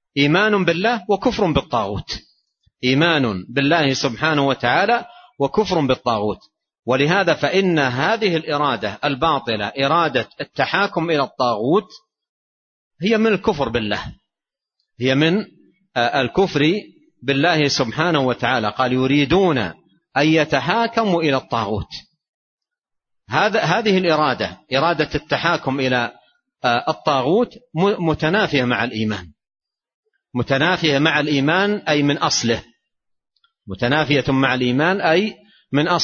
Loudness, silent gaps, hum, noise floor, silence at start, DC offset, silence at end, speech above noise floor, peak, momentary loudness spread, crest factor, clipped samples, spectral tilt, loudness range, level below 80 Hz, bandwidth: -18 LUFS; 6.79-6.83 s, 12.29-12.91 s, 22.28-22.58 s, 29.94-30.03 s; none; -87 dBFS; 0.15 s; under 0.1%; 0 s; 69 dB; -2 dBFS; 8 LU; 18 dB; under 0.1%; -5 dB/octave; 3 LU; -48 dBFS; 7.2 kHz